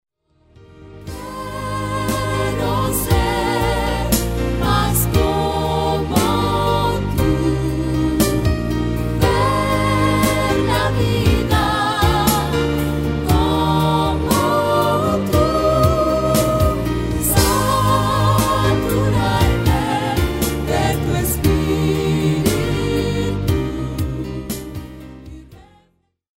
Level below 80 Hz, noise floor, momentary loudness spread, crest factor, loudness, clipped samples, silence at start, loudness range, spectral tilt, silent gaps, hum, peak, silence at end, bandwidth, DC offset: -28 dBFS; -62 dBFS; 8 LU; 16 dB; -18 LUFS; under 0.1%; 0.75 s; 4 LU; -5.5 dB/octave; none; none; 0 dBFS; 0.8 s; 16.5 kHz; under 0.1%